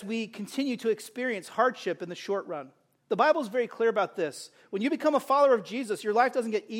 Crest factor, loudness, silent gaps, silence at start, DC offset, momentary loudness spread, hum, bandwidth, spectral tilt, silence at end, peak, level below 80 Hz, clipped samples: 18 dB; -28 LUFS; none; 0 s; under 0.1%; 10 LU; none; 16 kHz; -4.5 dB/octave; 0 s; -10 dBFS; -82 dBFS; under 0.1%